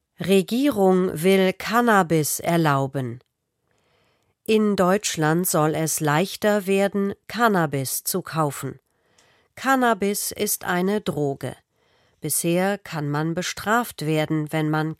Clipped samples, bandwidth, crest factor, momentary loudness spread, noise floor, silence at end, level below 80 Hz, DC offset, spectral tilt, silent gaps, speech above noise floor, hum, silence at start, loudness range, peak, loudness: under 0.1%; 16.5 kHz; 18 dB; 8 LU; -72 dBFS; 0.05 s; -60 dBFS; under 0.1%; -4.5 dB/octave; none; 50 dB; none; 0.2 s; 4 LU; -4 dBFS; -22 LUFS